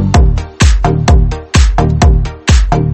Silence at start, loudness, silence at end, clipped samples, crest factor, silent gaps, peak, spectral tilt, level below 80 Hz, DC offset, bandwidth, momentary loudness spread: 0 s; -11 LUFS; 0 s; 0.4%; 8 dB; none; 0 dBFS; -5.5 dB/octave; -12 dBFS; under 0.1%; 8.8 kHz; 2 LU